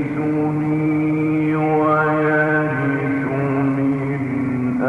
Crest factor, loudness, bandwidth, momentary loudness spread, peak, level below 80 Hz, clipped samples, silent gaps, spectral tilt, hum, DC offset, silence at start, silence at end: 12 dB; -19 LUFS; 4.7 kHz; 5 LU; -6 dBFS; -52 dBFS; under 0.1%; none; -9.5 dB/octave; none; under 0.1%; 0 s; 0 s